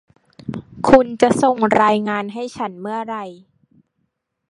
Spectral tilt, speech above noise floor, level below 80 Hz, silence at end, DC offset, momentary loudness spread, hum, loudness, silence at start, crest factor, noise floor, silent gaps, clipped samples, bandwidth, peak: -5.5 dB/octave; 55 dB; -48 dBFS; 1.15 s; under 0.1%; 18 LU; none; -17 LUFS; 0.45 s; 20 dB; -72 dBFS; none; under 0.1%; 11.5 kHz; 0 dBFS